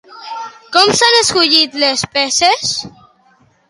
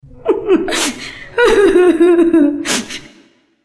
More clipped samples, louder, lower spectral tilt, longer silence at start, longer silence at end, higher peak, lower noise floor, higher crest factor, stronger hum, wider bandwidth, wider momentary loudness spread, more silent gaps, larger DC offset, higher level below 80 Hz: neither; about the same, -11 LUFS vs -12 LUFS; second, -1 dB/octave vs -3 dB/octave; second, 0.1 s vs 0.25 s; first, 0.8 s vs 0.65 s; about the same, 0 dBFS vs 0 dBFS; about the same, -52 dBFS vs -49 dBFS; about the same, 14 dB vs 12 dB; neither; first, 16 kHz vs 11 kHz; first, 18 LU vs 13 LU; neither; neither; second, -52 dBFS vs -40 dBFS